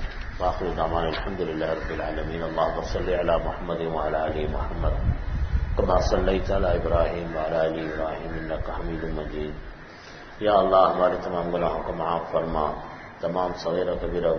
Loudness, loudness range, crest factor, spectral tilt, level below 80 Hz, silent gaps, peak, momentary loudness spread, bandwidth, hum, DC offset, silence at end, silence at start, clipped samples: -26 LUFS; 4 LU; 20 dB; -7 dB/octave; -32 dBFS; none; -6 dBFS; 9 LU; 6.6 kHz; none; under 0.1%; 0 s; 0 s; under 0.1%